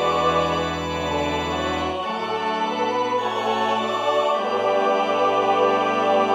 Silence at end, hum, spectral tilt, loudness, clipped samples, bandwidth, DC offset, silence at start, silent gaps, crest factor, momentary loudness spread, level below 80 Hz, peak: 0 s; none; -4.5 dB/octave; -22 LUFS; under 0.1%; 14.5 kHz; under 0.1%; 0 s; none; 14 dB; 6 LU; -48 dBFS; -6 dBFS